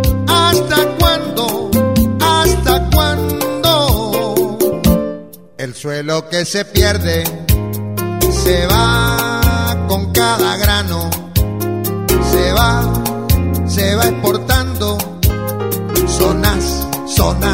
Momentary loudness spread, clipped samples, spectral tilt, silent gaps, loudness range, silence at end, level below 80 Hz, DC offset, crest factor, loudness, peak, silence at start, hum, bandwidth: 7 LU; under 0.1%; -4.5 dB/octave; none; 3 LU; 0 s; -22 dBFS; 0.7%; 14 dB; -14 LUFS; 0 dBFS; 0 s; none; 16.5 kHz